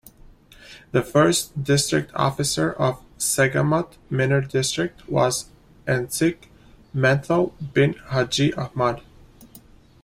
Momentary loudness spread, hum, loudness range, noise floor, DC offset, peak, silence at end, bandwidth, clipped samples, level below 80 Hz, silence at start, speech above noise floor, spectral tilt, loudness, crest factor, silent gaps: 6 LU; none; 2 LU; -49 dBFS; under 0.1%; -4 dBFS; 0.45 s; 16 kHz; under 0.1%; -50 dBFS; 0.7 s; 28 dB; -4.5 dB/octave; -22 LUFS; 18 dB; none